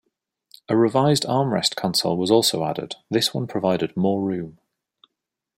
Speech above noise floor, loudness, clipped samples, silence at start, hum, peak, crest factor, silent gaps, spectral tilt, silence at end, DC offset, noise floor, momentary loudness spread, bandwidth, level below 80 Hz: 62 dB; -21 LUFS; under 0.1%; 0.7 s; none; -4 dBFS; 20 dB; none; -5 dB/octave; 1.05 s; under 0.1%; -83 dBFS; 9 LU; 16.5 kHz; -62 dBFS